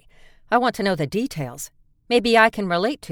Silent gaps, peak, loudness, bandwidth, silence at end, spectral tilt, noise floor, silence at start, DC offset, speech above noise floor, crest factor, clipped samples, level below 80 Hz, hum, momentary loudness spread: none; 0 dBFS; -20 LUFS; 19 kHz; 0 s; -4.5 dB/octave; -49 dBFS; 0.5 s; under 0.1%; 29 dB; 20 dB; under 0.1%; -52 dBFS; none; 15 LU